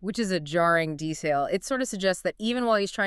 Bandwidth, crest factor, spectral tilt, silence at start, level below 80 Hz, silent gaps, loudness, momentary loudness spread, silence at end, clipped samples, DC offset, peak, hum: 13.5 kHz; 16 dB; -4.5 dB/octave; 0 s; -56 dBFS; none; -26 LUFS; 6 LU; 0 s; under 0.1%; under 0.1%; -10 dBFS; none